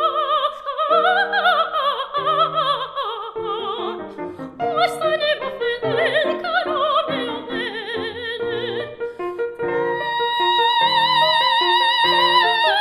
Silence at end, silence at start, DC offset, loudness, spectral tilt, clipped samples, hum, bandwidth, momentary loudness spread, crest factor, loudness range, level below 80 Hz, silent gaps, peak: 0 s; 0 s; under 0.1%; -19 LUFS; -3.5 dB/octave; under 0.1%; none; 14 kHz; 12 LU; 16 dB; 7 LU; -62 dBFS; none; -2 dBFS